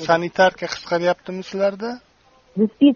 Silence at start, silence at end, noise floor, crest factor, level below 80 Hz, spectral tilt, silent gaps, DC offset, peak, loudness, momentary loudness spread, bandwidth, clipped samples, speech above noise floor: 0 s; 0 s; -55 dBFS; 18 dB; -60 dBFS; -4 dB/octave; none; under 0.1%; -2 dBFS; -21 LUFS; 14 LU; 7 kHz; under 0.1%; 36 dB